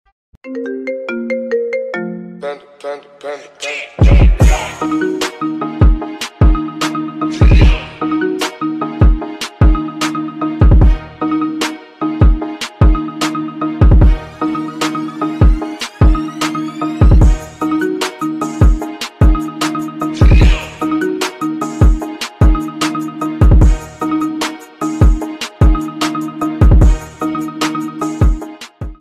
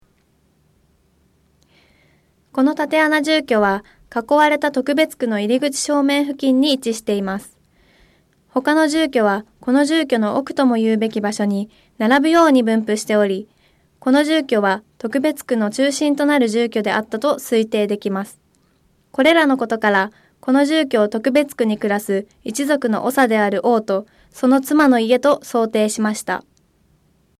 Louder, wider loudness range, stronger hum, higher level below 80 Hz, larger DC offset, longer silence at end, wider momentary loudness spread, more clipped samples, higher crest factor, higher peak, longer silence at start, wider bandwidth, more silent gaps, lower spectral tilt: about the same, -15 LUFS vs -17 LUFS; about the same, 1 LU vs 3 LU; neither; first, -14 dBFS vs -60 dBFS; neither; second, 0.05 s vs 1 s; first, 13 LU vs 9 LU; neither; about the same, 12 dB vs 14 dB; about the same, -2 dBFS vs -4 dBFS; second, 0.45 s vs 2.55 s; second, 13.5 kHz vs 15.5 kHz; neither; first, -6.5 dB/octave vs -4.5 dB/octave